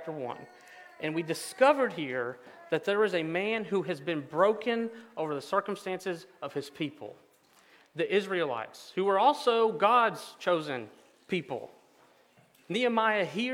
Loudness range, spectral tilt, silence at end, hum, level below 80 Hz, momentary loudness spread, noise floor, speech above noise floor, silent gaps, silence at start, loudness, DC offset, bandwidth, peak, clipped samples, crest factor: 7 LU; -5 dB/octave; 0 s; none; -84 dBFS; 14 LU; -63 dBFS; 33 dB; none; 0 s; -30 LUFS; under 0.1%; 17 kHz; -8 dBFS; under 0.1%; 22 dB